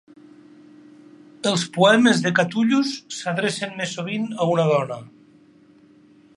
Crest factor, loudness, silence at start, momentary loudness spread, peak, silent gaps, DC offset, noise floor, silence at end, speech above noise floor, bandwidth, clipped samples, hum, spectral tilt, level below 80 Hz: 20 dB; -21 LUFS; 1.45 s; 11 LU; -2 dBFS; none; under 0.1%; -52 dBFS; 1.3 s; 32 dB; 11.5 kHz; under 0.1%; none; -4.5 dB/octave; -72 dBFS